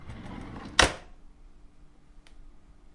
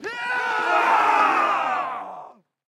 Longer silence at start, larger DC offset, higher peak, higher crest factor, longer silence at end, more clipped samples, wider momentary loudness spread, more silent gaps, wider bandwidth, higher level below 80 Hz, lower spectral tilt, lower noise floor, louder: about the same, 0 s vs 0 s; neither; first, -2 dBFS vs -6 dBFS; first, 32 dB vs 16 dB; second, 0.05 s vs 0.4 s; neither; first, 20 LU vs 15 LU; neither; second, 11.5 kHz vs 15.5 kHz; first, -46 dBFS vs -74 dBFS; about the same, -2 dB/octave vs -2.5 dB/octave; first, -53 dBFS vs -44 dBFS; second, -24 LUFS vs -20 LUFS